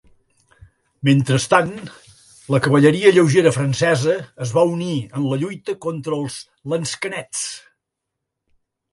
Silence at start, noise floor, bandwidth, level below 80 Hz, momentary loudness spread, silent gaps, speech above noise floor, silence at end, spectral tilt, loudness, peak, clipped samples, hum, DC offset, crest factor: 1.05 s; -80 dBFS; 11.5 kHz; -56 dBFS; 13 LU; none; 63 dB; 1.35 s; -5.5 dB/octave; -18 LUFS; 0 dBFS; under 0.1%; none; under 0.1%; 20 dB